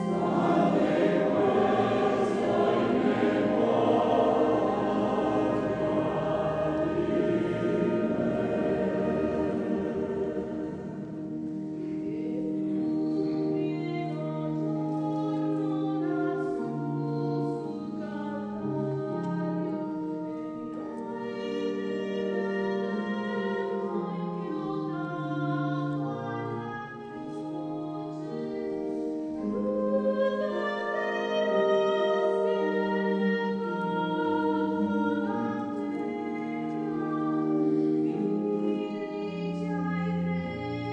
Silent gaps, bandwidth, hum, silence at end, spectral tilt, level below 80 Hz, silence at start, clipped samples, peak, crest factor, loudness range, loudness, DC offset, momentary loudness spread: none; 9.2 kHz; none; 0 s; -8 dB/octave; -60 dBFS; 0 s; under 0.1%; -12 dBFS; 16 dB; 7 LU; -29 LUFS; under 0.1%; 10 LU